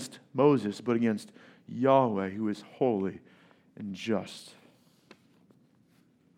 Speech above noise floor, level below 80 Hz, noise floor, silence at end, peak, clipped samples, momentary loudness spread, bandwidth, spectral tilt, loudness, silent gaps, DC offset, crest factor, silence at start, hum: 36 dB; -82 dBFS; -65 dBFS; 1.9 s; -10 dBFS; under 0.1%; 19 LU; 14.5 kHz; -7 dB/octave; -29 LUFS; none; under 0.1%; 20 dB; 0 s; none